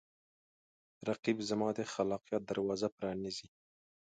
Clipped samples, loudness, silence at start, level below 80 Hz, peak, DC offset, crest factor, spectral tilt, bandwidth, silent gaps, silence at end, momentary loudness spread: under 0.1%; -37 LUFS; 1 s; -72 dBFS; -18 dBFS; under 0.1%; 20 dB; -5 dB/octave; 9 kHz; 1.19-1.23 s, 2.92-2.98 s; 0.7 s; 7 LU